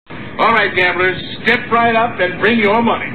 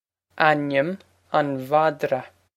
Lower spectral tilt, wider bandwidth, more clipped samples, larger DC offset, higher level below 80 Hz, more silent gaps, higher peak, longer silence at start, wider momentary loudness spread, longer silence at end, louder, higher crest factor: about the same, -6.5 dB/octave vs -6.5 dB/octave; second, 7.6 kHz vs 15 kHz; neither; first, 2% vs under 0.1%; first, -46 dBFS vs -72 dBFS; neither; second, -4 dBFS vs 0 dBFS; second, 0.05 s vs 0.35 s; second, 5 LU vs 9 LU; second, 0 s vs 0.3 s; first, -13 LUFS vs -23 LUFS; second, 12 dB vs 22 dB